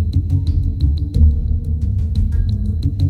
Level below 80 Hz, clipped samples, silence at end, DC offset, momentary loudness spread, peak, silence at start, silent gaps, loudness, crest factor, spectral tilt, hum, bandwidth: -18 dBFS; under 0.1%; 0 s; under 0.1%; 5 LU; -2 dBFS; 0 s; none; -18 LUFS; 14 dB; -9.5 dB/octave; none; 4.5 kHz